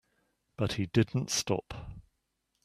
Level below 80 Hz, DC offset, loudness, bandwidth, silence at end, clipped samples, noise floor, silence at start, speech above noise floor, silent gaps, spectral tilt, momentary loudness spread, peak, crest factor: -56 dBFS; under 0.1%; -31 LUFS; 14.5 kHz; 0.65 s; under 0.1%; -80 dBFS; 0.6 s; 49 dB; none; -4.5 dB/octave; 16 LU; -10 dBFS; 24 dB